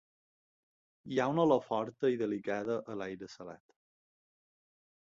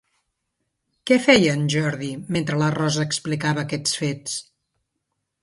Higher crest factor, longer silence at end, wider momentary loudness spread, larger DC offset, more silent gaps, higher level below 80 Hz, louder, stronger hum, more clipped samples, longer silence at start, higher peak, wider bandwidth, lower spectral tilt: about the same, 20 dB vs 22 dB; first, 1.5 s vs 1 s; first, 17 LU vs 14 LU; neither; neither; second, -76 dBFS vs -60 dBFS; second, -33 LUFS vs -21 LUFS; neither; neither; about the same, 1.05 s vs 1.05 s; second, -16 dBFS vs -2 dBFS; second, 7.6 kHz vs 11.5 kHz; first, -7 dB/octave vs -4.5 dB/octave